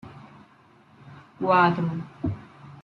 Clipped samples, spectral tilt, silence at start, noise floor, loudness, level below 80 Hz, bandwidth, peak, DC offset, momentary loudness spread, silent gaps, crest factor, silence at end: under 0.1%; -8.5 dB/octave; 0.05 s; -56 dBFS; -24 LUFS; -56 dBFS; 6.4 kHz; -8 dBFS; under 0.1%; 24 LU; none; 20 dB; 0 s